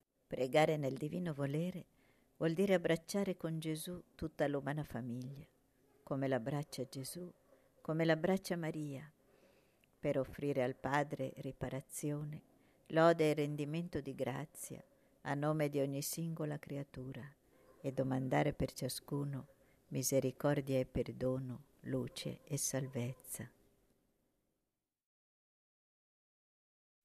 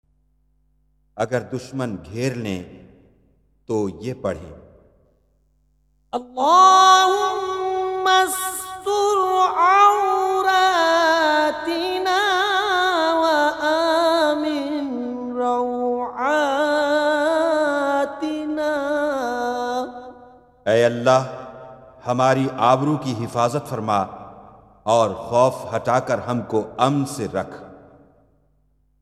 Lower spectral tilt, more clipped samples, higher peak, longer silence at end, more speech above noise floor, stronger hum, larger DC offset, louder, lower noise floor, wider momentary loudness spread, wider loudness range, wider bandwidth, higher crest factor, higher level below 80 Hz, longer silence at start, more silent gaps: first, -5.5 dB/octave vs -4 dB/octave; neither; second, -18 dBFS vs 0 dBFS; first, 3.55 s vs 1.25 s; first, over 52 dB vs 44 dB; neither; neither; second, -39 LUFS vs -19 LUFS; first, under -90 dBFS vs -63 dBFS; first, 15 LU vs 12 LU; second, 6 LU vs 12 LU; second, 14 kHz vs 15.5 kHz; about the same, 22 dB vs 20 dB; second, -66 dBFS vs -58 dBFS; second, 0.3 s vs 1.15 s; neither